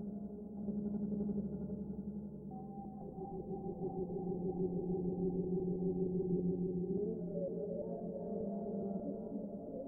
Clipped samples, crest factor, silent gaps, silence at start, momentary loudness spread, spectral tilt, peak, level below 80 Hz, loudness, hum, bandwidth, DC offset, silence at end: under 0.1%; 14 dB; none; 0 s; 10 LU; -14.5 dB/octave; -26 dBFS; -60 dBFS; -41 LUFS; none; 1.5 kHz; under 0.1%; 0 s